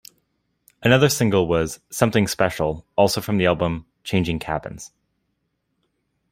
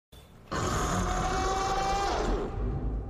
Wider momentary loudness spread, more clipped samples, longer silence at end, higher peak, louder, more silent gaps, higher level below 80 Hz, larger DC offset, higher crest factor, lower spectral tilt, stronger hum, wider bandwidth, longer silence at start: first, 12 LU vs 5 LU; neither; first, 1.45 s vs 0 s; first, -2 dBFS vs -18 dBFS; first, -21 LUFS vs -30 LUFS; neither; second, -48 dBFS vs -36 dBFS; neither; first, 20 dB vs 12 dB; about the same, -5 dB/octave vs -4.5 dB/octave; neither; about the same, 16 kHz vs 15 kHz; first, 0.8 s vs 0.15 s